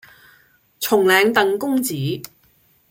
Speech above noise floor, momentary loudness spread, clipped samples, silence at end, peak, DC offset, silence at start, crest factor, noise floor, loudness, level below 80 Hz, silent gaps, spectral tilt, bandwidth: 41 dB; 14 LU; under 0.1%; 0.65 s; -2 dBFS; under 0.1%; 0.8 s; 20 dB; -58 dBFS; -18 LUFS; -64 dBFS; none; -4 dB/octave; 17 kHz